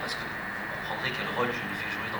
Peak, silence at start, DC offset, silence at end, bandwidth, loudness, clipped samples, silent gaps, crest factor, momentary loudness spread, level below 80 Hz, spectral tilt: -16 dBFS; 0 s; under 0.1%; 0 s; over 20 kHz; -31 LUFS; under 0.1%; none; 16 dB; 4 LU; -56 dBFS; -4 dB/octave